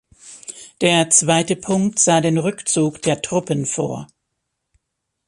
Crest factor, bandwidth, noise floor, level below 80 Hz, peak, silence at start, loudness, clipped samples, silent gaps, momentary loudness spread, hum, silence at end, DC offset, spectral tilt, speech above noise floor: 20 dB; 11.5 kHz; -77 dBFS; -58 dBFS; 0 dBFS; 0.25 s; -17 LUFS; under 0.1%; none; 19 LU; none; 1.2 s; under 0.1%; -3.5 dB/octave; 59 dB